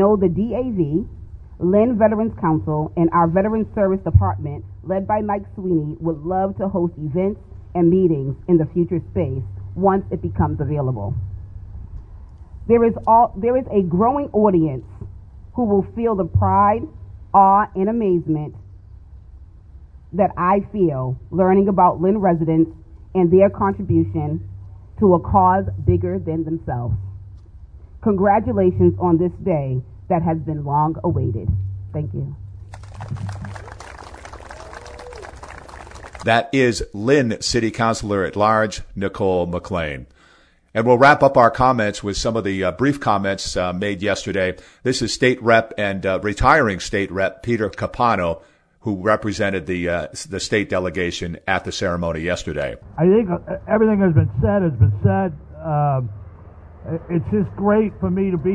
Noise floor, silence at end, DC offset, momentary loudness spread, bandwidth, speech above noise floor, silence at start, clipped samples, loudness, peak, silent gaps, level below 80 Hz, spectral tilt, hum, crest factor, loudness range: -53 dBFS; 0 s; under 0.1%; 18 LU; 10.5 kHz; 35 dB; 0 s; under 0.1%; -19 LUFS; 0 dBFS; none; -38 dBFS; -6.5 dB/octave; none; 20 dB; 6 LU